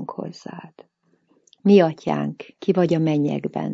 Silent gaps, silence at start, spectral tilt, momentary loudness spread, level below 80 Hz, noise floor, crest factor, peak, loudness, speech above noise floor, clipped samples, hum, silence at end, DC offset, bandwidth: none; 0 s; -8 dB/octave; 20 LU; -68 dBFS; -64 dBFS; 18 dB; -4 dBFS; -20 LUFS; 44 dB; under 0.1%; none; 0 s; under 0.1%; 7.4 kHz